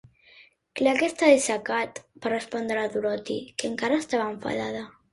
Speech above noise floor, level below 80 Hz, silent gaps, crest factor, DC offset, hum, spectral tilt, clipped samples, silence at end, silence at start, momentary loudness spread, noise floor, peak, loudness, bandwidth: 30 dB; -66 dBFS; none; 22 dB; under 0.1%; none; -3.5 dB/octave; under 0.1%; 0.25 s; 0.4 s; 13 LU; -56 dBFS; -6 dBFS; -26 LUFS; 11.5 kHz